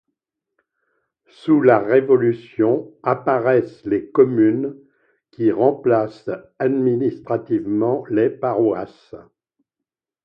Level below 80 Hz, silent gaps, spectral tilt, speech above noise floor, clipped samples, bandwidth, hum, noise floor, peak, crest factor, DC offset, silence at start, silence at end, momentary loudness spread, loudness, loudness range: -64 dBFS; none; -10 dB/octave; 67 dB; under 0.1%; 5.4 kHz; none; -85 dBFS; 0 dBFS; 18 dB; under 0.1%; 1.45 s; 1.05 s; 11 LU; -19 LUFS; 4 LU